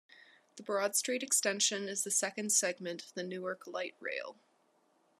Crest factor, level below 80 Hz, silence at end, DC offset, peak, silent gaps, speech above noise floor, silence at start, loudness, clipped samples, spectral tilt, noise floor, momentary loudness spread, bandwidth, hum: 20 dB; under -90 dBFS; 0.9 s; under 0.1%; -16 dBFS; none; 37 dB; 0.15 s; -33 LUFS; under 0.1%; -1 dB/octave; -72 dBFS; 12 LU; 13.5 kHz; none